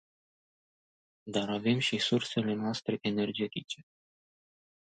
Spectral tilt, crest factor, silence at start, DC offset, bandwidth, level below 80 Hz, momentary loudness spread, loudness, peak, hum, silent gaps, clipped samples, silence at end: -5 dB/octave; 18 dB; 1.25 s; under 0.1%; 9.4 kHz; -72 dBFS; 12 LU; -32 LUFS; -16 dBFS; none; none; under 0.1%; 1.05 s